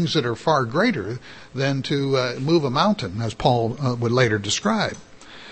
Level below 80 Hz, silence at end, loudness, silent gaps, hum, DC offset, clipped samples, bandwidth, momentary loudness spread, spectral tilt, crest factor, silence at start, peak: -52 dBFS; 0 s; -22 LUFS; none; none; 0.3%; under 0.1%; 8.8 kHz; 9 LU; -5 dB/octave; 18 dB; 0 s; -4 dBFS